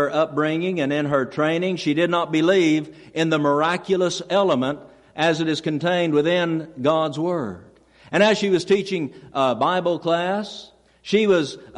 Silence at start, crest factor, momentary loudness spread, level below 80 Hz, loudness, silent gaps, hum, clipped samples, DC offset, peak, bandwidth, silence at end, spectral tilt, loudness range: 0 s; 16 dB; 9 LU; -62 dBFS; -21 LUFS; none; none; under 0.1%; under 0.1%; -6 dBFS; 11 kHz; 0 s; -5.5 dB/octave; 2 LU